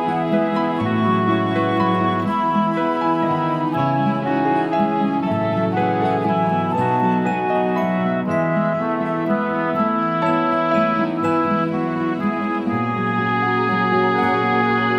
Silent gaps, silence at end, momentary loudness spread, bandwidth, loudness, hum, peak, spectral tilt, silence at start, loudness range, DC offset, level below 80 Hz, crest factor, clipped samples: none; 0 s; 3 LU; 9.6 kHz; -19 LUFS; none; -4 dBFS; -8 dB/octave; 0 s; 1 LU; under 0.1%; -58 dBFS; 14 dB; under 0.1%